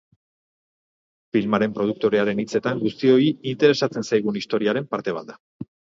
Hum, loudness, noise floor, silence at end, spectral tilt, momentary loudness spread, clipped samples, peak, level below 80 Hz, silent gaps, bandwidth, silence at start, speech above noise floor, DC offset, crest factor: none; -22 LUFS; under -90 dBFS; 0.3 s; -6 dB/octave; 10 LU; under 0.1%; -4 dBFS; -64 dBFS; 5.40-5.60 s; 7.8 kHz; 1.35 s; over 69 dB; under 0.1%; 20 dB